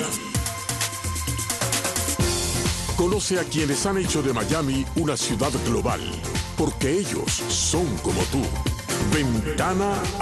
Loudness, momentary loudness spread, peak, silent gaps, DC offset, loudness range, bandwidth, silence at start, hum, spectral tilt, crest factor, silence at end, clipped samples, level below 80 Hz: -24 LUFS; 4 LU; -8 dBFS; none; under 0.1%; 1 LU; 12.5 kHz; 0 s; none; -4 dB/octave; 16 dB; 0 s; under 0.1%; -36 dBFS